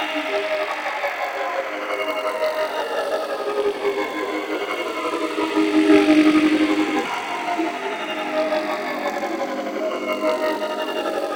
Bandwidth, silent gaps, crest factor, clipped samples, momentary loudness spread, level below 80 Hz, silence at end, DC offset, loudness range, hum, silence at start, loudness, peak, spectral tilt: 17 kHz; none; 18 dB; under 0.1%; 10 LU; -64 dBFS; 0 s; under 0.1%; 5 LU; none; 0 s; -22 LUFS; -4 dBFS; -3.5 dB/octave